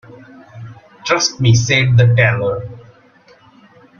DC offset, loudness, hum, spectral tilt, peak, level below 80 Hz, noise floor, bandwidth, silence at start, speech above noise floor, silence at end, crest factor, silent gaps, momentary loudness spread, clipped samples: under 0.1%; -13 LUFS; none; -4.5 dB/octave; 0 dBFS; -46 dBFS; -48 dBFS; 7.2 kHz; 0.1 s; 35 dB; 1.2 s; 16 dB; none; 24 LU; under 0.1%